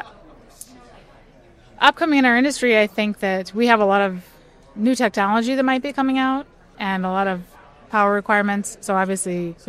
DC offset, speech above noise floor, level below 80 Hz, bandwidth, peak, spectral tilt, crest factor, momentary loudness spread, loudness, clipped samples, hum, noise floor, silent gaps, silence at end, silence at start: under 0.1%; 30 dB; -54 dBFS; 15 kHz; 0 dBFS; -4.5 dB/octave; 20 dB; 10 LU; -19 LUFS; under 0.1%; none; -49 dBFS; none; 0.15 s; 0 s